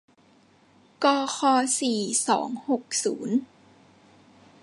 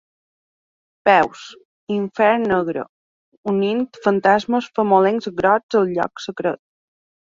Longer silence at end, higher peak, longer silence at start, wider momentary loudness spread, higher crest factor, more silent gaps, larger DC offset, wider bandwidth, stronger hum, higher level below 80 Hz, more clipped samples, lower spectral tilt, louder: first, 1.2 s vs 0.75 s; second, -6 dBFS vs -2 dBFS; about the same, 1 s vs 1.05 s; second, 6 LU vs 12 LU; about the same, 20 dB vs 18 dB; second, none vs 1.65-1.87 s, 2.89-3.43 s, 5.63-5.69 s; neither; first, 11.5 kHz vs 7.6 kHz; neither; second, -78 dBFS vs -58 dBFS; neither; second, -2.5 dB/octave vs -6.5 dB/octave; second, -25 LUFS vs -19 LUFS